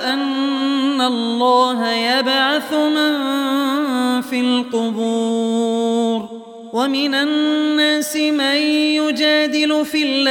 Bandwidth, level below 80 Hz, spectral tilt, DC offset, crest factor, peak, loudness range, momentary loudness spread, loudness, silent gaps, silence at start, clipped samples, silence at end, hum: 17.5 kHz; -70 dBFS; -3 dB/octave; under 0.1%; 14 dB; -4 dBFS; 3 LU; 4 LU; -17 LUFS; none; 0 s; under 0.1%; 0 s; none